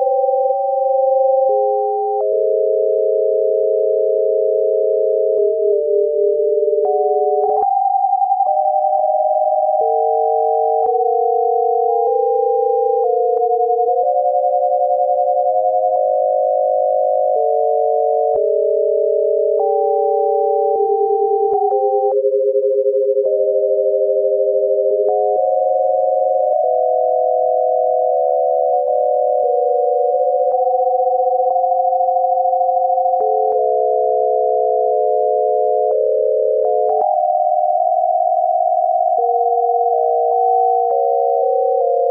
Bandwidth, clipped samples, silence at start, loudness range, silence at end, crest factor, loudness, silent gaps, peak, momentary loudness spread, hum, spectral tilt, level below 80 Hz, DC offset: 1.3 kHz; under 0.1%; 0 s; 0 LU; 0 s; 10 dB; -16 LUFS; none; -6 dBFS; 0 LU; none; -9.5 dB/octave; -74 dBFS; under 0.1%